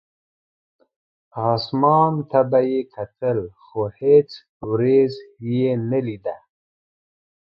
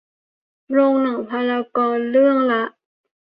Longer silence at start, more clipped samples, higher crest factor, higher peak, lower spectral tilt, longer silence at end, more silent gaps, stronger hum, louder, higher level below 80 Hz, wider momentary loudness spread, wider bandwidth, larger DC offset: first, 1.35 s vs 0.7 s; neither; about the same, 18 dB vs 14 dB; about the same, -4 dBFS vs -6 dBFS; about the same, -9.5 dB/octave vs -8.5 dB/octave; first, 1.2 s vs 0.65 s; first, 4.49-4.60 s vs none; neither; about the same, -20 LUFS vs -18 LUFS; first, -60 dBFS vs -70 dBFS; first, 16 LU vs 7 LU; first, 5.8 kHz vs 5.2 kHz; neither